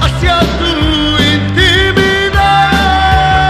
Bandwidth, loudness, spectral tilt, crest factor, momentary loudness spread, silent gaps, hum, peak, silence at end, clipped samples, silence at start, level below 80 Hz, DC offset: 14.5 kHz; -9 LUFS; -5 dB/octave; 10 dB; 3 LU; none; none; 0 dBFS; 0 s; 0.1%; 0 s; -18 dBFS; under 0.1%